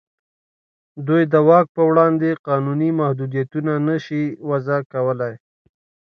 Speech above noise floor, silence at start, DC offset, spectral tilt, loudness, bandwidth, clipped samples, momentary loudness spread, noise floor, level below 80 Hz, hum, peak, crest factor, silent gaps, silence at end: over 72 dB; 0.95 s; under 0.1%; -9.5 dB/octave; -18 LUFS; 6.4 kHz; under 0.1%; 9 LU; under -90 dBFS; -68 dBFS; none; 0 dBFS; 18 dB; 1.69-1.75 s, 2.39-2.44 s, 4.86-4.90 s; 0.8 s